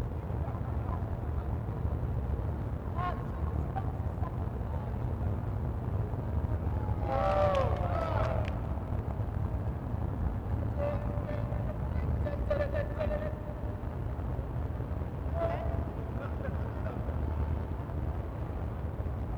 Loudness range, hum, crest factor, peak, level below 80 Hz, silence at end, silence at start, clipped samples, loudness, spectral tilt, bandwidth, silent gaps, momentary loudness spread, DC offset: 4 LU; none; 18 dB; -16 dBFS; -38 dBFS; 0 s; 0 s; under 0.1%; -34 LUFS; -9 dB/octave; 6.4 kHz; none; 6 LU; under 0.1%